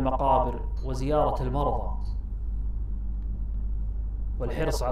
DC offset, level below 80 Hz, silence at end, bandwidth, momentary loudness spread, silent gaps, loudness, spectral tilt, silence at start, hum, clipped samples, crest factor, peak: under 0.1%; -30 dBFS; 0 s; 12.5 kHz; 10 LU; none; -30 LUFS; -7 dB/octave; 0 s; none; under 0.1%; 16 dB; -10 dBFS